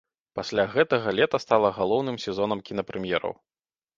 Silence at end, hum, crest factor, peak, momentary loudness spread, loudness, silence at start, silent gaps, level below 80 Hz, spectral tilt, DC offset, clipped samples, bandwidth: 0.65 s; none; 22 dB; -4 dBFS; 12 LU; -25 LUFS; 0.35 s; none; -60 dBFS; -5.5 dB/octave; under 0.1%; under 0.1%; 7.6 kHz